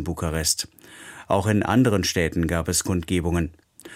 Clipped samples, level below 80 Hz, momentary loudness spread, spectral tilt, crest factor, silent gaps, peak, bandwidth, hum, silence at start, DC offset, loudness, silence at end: under 0.1%; -40 dBFS; 14 LU; -4.5 dB/octave; 18 dB; none; -4 dBFS; 16.5 kHz; none; 0 s; under 0.1%; -23 LUFS; 0 s